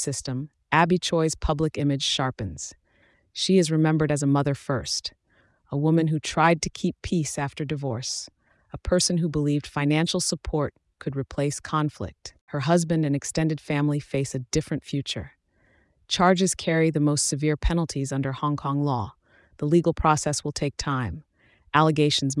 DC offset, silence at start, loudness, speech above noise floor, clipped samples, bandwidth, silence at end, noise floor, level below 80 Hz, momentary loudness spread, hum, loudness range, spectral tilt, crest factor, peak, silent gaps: under 0.1%; 0 s; -25 LUFS; 39 dB; under 0.1%; 12 kHz; 0 s; -64 dBFS; -42 dBFS; 12 LU; none; 3 LU; -5 dB/octave; 20 dB; -6 dBFS; 12.41-12.47 s